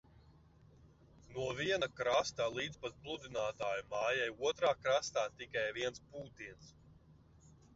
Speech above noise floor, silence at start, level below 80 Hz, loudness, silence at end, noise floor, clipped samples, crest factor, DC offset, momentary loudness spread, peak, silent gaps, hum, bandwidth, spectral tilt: 26 dB; 1.3 s; -66 dBFS; -37 LUFS; 0.25 s; -64 dBFS; under 0.1%; 20 dB; under 0.1%; 15 LU; -20 dBFS; none; none; 7.6 kHz; -1.5 dB/octave